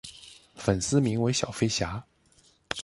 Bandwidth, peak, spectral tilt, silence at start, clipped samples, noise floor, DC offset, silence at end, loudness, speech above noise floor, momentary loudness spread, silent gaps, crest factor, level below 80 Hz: 11.5 kHz; -8 dBFS; -4.5 dB/octave; 0.05 s; under 0.1%; -62 dBFS; under 0.1%; 0 s; -27 LUFS; 36 dB; 19 LU; none; 20 dB; -50 dBFS